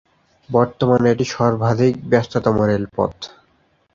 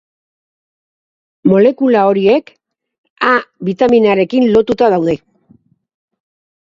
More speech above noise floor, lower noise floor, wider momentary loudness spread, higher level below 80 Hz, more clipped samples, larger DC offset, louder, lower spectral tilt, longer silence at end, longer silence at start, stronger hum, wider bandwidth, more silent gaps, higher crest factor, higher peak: first, 43 dB vs 39 dB; first, -60 dBFS vs -51 dBFS; about the same, 7 LU vs 7 LU; about the same, -48 dBFS vs -52 dBFS; neither; neither; second, -18 LUFS vs -12 LUFS; about the same, -7 dB/octave vs -7.5 dB/octave; second, 0.7 s vs 1.6 s; second, 0.5 s vs 1.45 s; neither; about the same, 7.6 kHz vs 7.4 kHz; second, none vs 2.98-3.04 s, 3.10-3.16 s; about the same, 18 dB vs 14 dB; about the same, 0 dBFS vs 0 dBFS